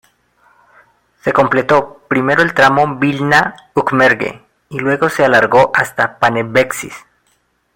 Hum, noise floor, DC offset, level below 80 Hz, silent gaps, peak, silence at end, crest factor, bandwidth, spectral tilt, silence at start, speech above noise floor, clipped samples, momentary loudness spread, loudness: 60 Hz at -50 dBFS; -60 dBFS; under 0.1%; -50 dBFS; none; 0 dBFS; 0.75 s; 14 dB; 16.5 kHz; -5 dB/octave; 1.25 s; 47 dB; under 0.1%; 9 LU; -13 LUFS